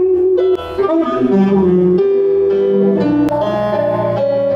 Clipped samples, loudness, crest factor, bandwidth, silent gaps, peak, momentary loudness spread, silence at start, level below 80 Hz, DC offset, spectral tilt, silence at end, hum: under 0.1%; -14 LUFS; 10 dB; 6 kHz; none; -2 dBFS; 4 LU; 0 s; -46 dBFS; under 0.1%; -9 dB/octave; 0 s; none